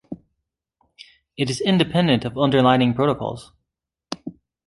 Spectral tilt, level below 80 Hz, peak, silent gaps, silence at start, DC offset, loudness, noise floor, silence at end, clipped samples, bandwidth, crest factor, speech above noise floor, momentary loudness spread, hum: -6 dB/octave; -54 dBFS; -2 dBFS; none; 0.1 s; under 0.1%; -19 LUFS; -82 dBFS; 0.35 s; under 0.1%; 11.5 kHz; 20 dB; 63 dB; 23 LU; none